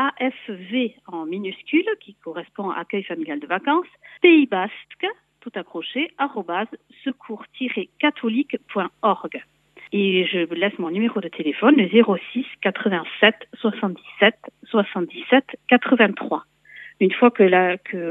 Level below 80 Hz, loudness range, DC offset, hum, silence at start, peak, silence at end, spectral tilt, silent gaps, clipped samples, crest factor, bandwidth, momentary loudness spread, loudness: -76 dBFS; 7 LU; under 0.1%; none; 0 s; 0 dBFS; 0 s; -8 dB/octave; none; under 0.1%; 20 dB; 4 kHz; 16 LU; -21 LUFS